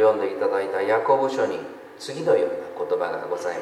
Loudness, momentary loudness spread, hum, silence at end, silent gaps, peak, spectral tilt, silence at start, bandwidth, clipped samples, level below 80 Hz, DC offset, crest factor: -24 LUFS; 12 LU; none; 0 s; none; -8 dBFS; -5 dB/octave; 0 s; 12 kHz; under 0.1%; -74 dBFS; under 0.1%; 16 dB